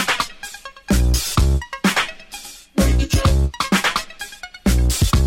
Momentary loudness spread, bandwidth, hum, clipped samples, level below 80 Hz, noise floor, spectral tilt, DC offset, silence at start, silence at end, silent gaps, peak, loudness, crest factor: 15 LU; 17 kHz; none; under 0.1%; -22 dBFS; -37 dBFS; -4.5 dB/octave; under 0.1%; 0 s; 0 s; none; -4 dBFS; -19 LUFS; 14 dB